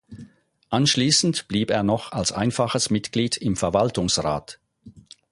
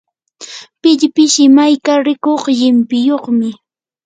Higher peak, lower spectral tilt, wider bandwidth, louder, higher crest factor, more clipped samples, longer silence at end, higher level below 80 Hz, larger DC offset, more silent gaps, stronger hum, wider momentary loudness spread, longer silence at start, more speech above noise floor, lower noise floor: second, -4 dBFS vs 0 dBFS; about the same, -4 dB/octave vs -3 dB/octave; first, 11.5 kHz vs 9.4 kHz; second, -22 LUFS vs -11 LUFS; first, 18 dB vs 12 dB; neither; second, 0.3 s vs 0.5 s; first, -48 dBFS vs -64 dBFS; neither; neither; neither; second, 7 LU vs 13 LU; second, 0.1 s vs 0.4 s; about the same, 28 dB vs 25 dB; first, -50 dBFS vs -35 dBFS